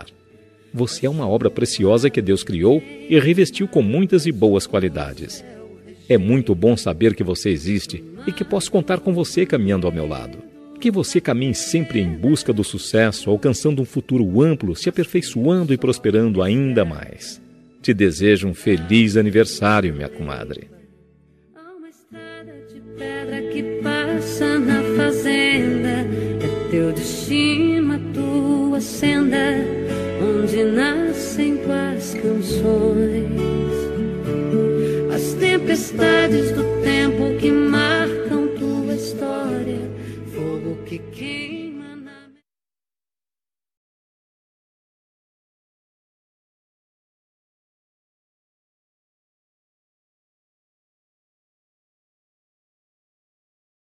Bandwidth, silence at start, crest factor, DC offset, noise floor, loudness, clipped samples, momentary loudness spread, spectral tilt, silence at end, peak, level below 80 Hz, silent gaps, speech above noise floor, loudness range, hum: 14.5 kHz; 0 s; 20 dB; under 0.1%; under -90 dBFS; -19 LUFS; under 0.1%; 13 LU; -5.5 dB/octave; 11.65 s; -2 dBFS; -46 dBFS; none; over 72 dB; 10 LU; none